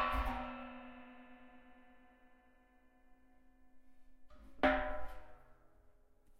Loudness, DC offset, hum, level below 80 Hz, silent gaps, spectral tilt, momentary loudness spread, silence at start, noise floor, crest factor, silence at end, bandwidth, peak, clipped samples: -39 LUFS; under 0.1%; none; -52 dBFS; none; -6.5 dB/octave; 25 LU; 0 s; -67 dBFS; 24 dB; 0.05 s; 16 kHz; -18 dBFS; under 0.1%